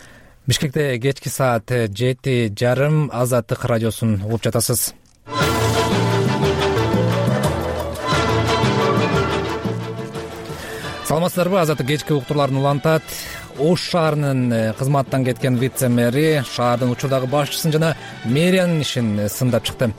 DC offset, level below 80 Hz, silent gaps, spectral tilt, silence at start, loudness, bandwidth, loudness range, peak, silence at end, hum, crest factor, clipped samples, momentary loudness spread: under 0.1%; -42 dBFS; none; -5.5 dB/octave; 0 s; -19 LUFS; 16.5 kHz; 2 LU; -6 dBFS; 0 s; none; 12 dB; under 0.1%; 7 LU